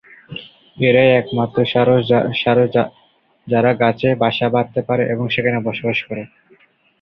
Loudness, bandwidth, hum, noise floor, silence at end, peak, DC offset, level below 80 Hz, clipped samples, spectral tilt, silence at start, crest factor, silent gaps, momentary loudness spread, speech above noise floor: -16 LUFS; 5.8 kHz; none; -53 dBFS; 0.75 s; -2 dBFS; under 0.1%; -54 dBFS; under 0.1%; -9 dB/octave; 0.3 s; 16 dB; none; 15 LU; 37 dB